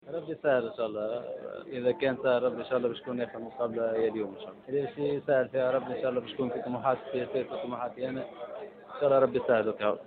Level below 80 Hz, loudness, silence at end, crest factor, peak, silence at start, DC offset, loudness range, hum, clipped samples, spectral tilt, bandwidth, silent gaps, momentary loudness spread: -70 dBFS; -31 LUFS; 0 s; 18 dB; -12 dBFS; 0.05 s; under 0.1%; 2 LU; none; under 0.1%; -9.5 dB/octave; 4.6 kHz; none; 12 LU